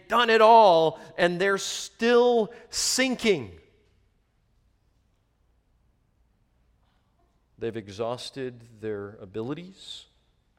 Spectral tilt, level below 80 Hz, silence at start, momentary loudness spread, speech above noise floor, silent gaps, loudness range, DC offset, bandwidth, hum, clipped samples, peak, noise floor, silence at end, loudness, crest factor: -3 dB/octave; -62 dBFS; 0.1 s; 21 LU; 44 dB; none; 18 LU; under 0.1%; 16.5 kHz; none; under 0.1%; -4 dBFS; -68 dBFS; 0.6 s; -23 LUFS; 22 dB